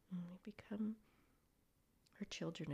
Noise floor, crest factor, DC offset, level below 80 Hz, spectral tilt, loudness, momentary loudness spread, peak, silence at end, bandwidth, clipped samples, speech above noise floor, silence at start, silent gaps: -78 dBFS; 14 dB; under 0.1%; -78 dBFS; -5.5 dB/octave; -49 LUFS; 10 LU; -36 dBFS; 0 s; 14.5 kHz; under 0.1%; 31 dB; 0.1 s; none